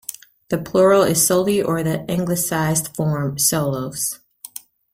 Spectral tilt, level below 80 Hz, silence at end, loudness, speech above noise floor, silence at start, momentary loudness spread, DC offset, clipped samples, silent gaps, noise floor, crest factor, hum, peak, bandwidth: -4.5 dB/octave; -52 dBFS; 0.8 s; -19 LUFS; 21 dB; 0.1 s; 20 LU; under 0.1%; under 0.1%; none; -39 dBFS; 16 dB; none; -4 dBFS; 16.5 kHz